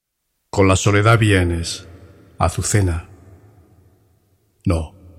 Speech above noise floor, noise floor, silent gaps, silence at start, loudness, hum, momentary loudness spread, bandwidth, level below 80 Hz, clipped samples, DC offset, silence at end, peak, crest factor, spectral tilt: 57 dB; -73 dBFS; none; 0.55 s; -18 LUFS; none; 13 LU; 14 kHz; -36 dBFS; under 0.1%; under 0.1%; 0.3 s; 0 dBFS; 20 dB; -5 dB/octave